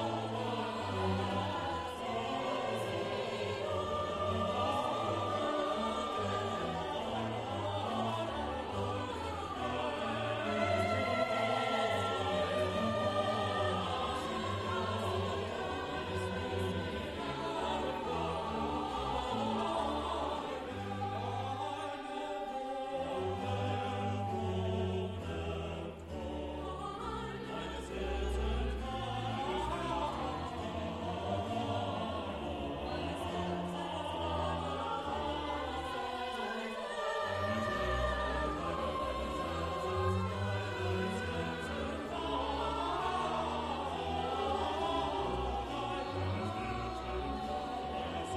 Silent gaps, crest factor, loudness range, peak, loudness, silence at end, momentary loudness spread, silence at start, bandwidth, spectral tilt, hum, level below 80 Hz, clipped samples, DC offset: none; 16 dB; 4 LU; -20 dBFS; -36 LUFS; 0 s; 6 LU; 0 s; 13 kHz; -5.5 dB/octave; none; -50 dBFS; under 0.1%; under 0.1%